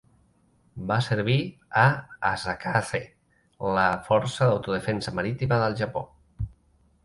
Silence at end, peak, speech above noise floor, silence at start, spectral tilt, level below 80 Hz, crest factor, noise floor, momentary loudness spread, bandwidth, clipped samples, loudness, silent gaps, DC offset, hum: 0.55 s; -4 dBFS; 38 dB; 0.75 s; -6 dB/octave; -50 dBFS; 22 dB; -63 dBFS; 14 LU; 11.5 kHz; under 0.1%; -26 LUFS; none; under 0.1%; none